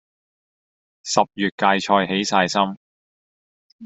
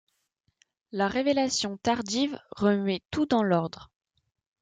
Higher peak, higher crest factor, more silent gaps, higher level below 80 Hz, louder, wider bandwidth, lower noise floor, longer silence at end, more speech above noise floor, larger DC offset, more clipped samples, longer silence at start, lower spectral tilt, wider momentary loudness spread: first, -2 dBFS vs -10 dBFS; about the same, 22 dB vs 18 dB; first, 1.52-1.58 s, 2.77-3.79 s vs none; about the same, -64 dBFS vs -62 dBFS; first, -20 LUFS vs -27 LUFS; second, 8.2 kHz vs 9.4 kHz; first, under -90 dBFS vs -75 dBFS; second, 0 s vs 0.75 s; first, over 70 dB vs 49 dB; neither; neither; about the same, 1.05 s vs 0.95 s; about the same, -3.5 dB/octave vs -4.5 dB/octave; about the same, 5 LU vs 6 LU